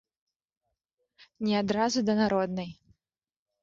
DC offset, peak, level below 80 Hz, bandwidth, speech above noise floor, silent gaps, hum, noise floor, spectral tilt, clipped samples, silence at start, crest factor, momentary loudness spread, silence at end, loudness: under 0.1%; -14 dBFS; -64 dBFS; 7.6 kHz; 61 dB; none; none; -88 dBFS; -5 dB/octave; under 0.1%; 1.2 s; 18 dB; 10 LU; 0.9 s; -28 LUFS